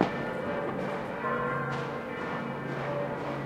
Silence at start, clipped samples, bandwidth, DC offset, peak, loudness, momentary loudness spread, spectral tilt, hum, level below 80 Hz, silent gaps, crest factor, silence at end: 0 s; under 0.1%; 15 kHz; under 0.1%; -8 dBFS; -33 LUFS; 4 LU; -7 dB/octave; none; -60 dBFS; none; 24 dB; 0 s